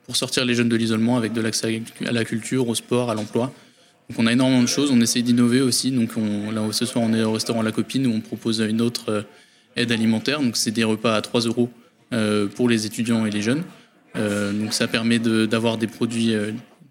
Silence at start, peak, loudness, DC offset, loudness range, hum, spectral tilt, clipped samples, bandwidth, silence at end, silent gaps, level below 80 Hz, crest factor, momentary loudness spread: 0.1 s; -4 dBFS; -21 LUFS; under 0.1%; 3 LU; none; -4.5 dB/octave; under 0.1%; 16 kHz; 0.25 s; none; -64 dBFS; 18 dB; 8 LU